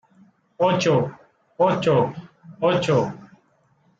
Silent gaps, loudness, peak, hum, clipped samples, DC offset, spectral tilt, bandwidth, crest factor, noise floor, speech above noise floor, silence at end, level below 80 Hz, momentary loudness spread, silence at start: none; -21 LUFS; -6 dBFS; none; under 0.1%; under 0.1%; -6 dB/octave; 8 kHz; 16 dB; -62 dBFS; 43 dB; 0.75 s; -60 dBFS; 12 LU; 0.6 s